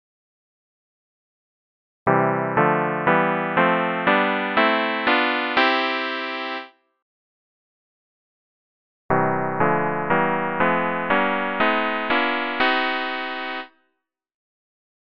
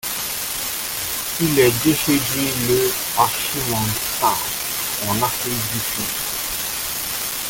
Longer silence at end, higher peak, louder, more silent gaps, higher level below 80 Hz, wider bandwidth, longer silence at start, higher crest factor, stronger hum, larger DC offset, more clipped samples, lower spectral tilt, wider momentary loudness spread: first, 0.75 s vs 0 s; about the same, -4 dBFS vs -2 dBFS; about the same, -21 LUFS vs -19 LUFS; first, 7.02-9.09 s vs none; second, -58 dBFS vs -46 dBFS; second, 6.2 kHz vs 17 kHz; first, 2.05 s vs 0.05 s; about the same, 20 dB vs 20 dB; neither; neither; neither; first, -7.5 dB/octave vs -3 dB/octave; about the same, 8 LU vs 6 LU